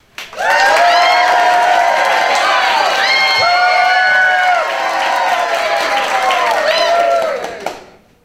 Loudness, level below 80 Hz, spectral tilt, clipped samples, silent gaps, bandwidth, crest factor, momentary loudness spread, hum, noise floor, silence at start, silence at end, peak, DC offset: -11 LUFS; -54 dBFS; -0.5 dB/octave; under 0.1%; none; 16 kHz; 12 dB; 6 LU; none; -38 dBFS; 0.2 s; 0.4 s; 0 dBFS; under 0.1%